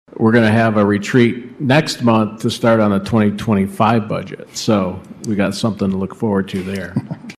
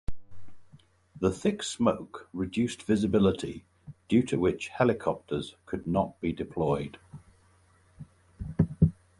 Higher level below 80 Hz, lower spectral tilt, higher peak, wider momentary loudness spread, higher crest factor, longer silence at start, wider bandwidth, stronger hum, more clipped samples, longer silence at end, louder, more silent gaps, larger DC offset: about the same, -50 dBFS vs -48 dBFS; about the same, -6.5 dB/octave vs -6.5 dB/octave; first, -2 dBFS vs -8 dBFS; second, 10 LU vs 14 LU; second, 14 dB vs 20 dB; about the same, 0.2 s vs 0.1 s; first, 14 kHz vs 11.5 kHz; neither; neither; second, 0.05 s vs 0.25 s; first, -16 LUFS vs -29 LUFS; neither; neither